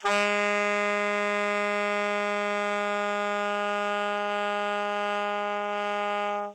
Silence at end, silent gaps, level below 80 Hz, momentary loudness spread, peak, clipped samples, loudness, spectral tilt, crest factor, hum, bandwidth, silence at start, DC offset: 0 s; none; -84 dBFS; 4 LU; -12 dBFS; under 0.1%; -27 LUFS; -3.5 dB/octave; 16 dB; none; 13.5 kHz; 0 s; under 0.1%